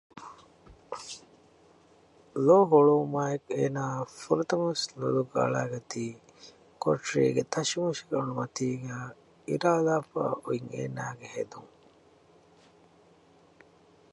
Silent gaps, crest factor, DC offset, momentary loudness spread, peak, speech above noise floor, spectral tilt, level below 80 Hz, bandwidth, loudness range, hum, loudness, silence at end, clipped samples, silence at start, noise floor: none; 22 dB; under 0.1%; 19 LU; -8 dBFS; 32 dB; -5.5 dB/octave; -70 dBFS; 11.5 kHz; 11 LU; none; -28 LUFS; 2.45 s; under 0.1%; 0.15 s; -60 dBFS